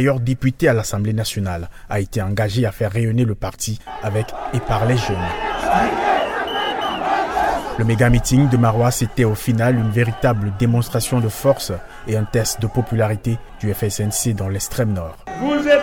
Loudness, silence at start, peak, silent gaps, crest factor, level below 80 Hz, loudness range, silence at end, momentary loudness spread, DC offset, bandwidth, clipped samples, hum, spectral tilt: -19 LUFS; 0 s; -2 dBFS; none; 16 dB; -34 dBFS; 4 LU; 0 s; 9 LU; under 0.1%; 17.5 kHz; under 0.1%; none; -5.5 dB/octave